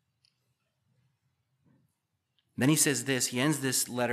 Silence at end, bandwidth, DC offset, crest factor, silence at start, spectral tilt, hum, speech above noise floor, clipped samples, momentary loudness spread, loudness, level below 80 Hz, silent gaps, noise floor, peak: 0 s; 15 kHz; under 0.1%; 20 dB; 2.6 s; -3.5 dB/octave; none; 53 dB; under 0.1%; 5 LU; -27 LUFS; -82 dBFS; none; -81 dBFS; -12 dBFS